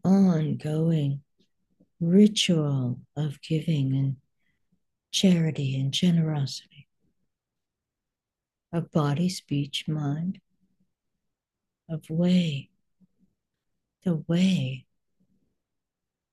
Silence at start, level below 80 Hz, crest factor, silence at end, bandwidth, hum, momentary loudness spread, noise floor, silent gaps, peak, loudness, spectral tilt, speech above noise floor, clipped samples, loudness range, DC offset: 0.05 s; -66 dBFS; 20 dB; 1.5 s; 12.5 kHz; none; 13 LU; -89 dBFS; none; -8 dBFS; -26 LUFS; -6 dB/octave; 64 dB; under 0.1%; 6 LU; under 0.1%